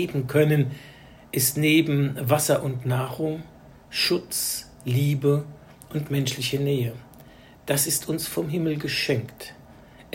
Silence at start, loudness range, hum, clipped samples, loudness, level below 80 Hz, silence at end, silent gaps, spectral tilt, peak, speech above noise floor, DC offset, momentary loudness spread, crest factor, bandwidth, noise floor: 0 s; 4 LU; none; under 0.1%; -24 LUFS; -56 dBFS; 0.1 s; none; -4.5 dB/octave; -6 dBFS; 25 dB; under 0.1%; 13 LU; 18 dB; 16.5 kHz; -49 dBFS